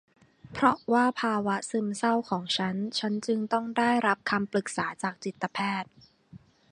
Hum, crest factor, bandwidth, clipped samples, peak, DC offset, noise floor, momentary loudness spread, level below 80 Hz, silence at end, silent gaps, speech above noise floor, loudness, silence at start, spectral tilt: none; 22 dB; 11 kHz; under 0.1%; -6 dBFS; under 0.1%; -54 dBFS; 9 LU; -68 dBFS; 0.35 s; none; 26 dB; -28 LUFS; 0.45 s; -4.5 dB/octave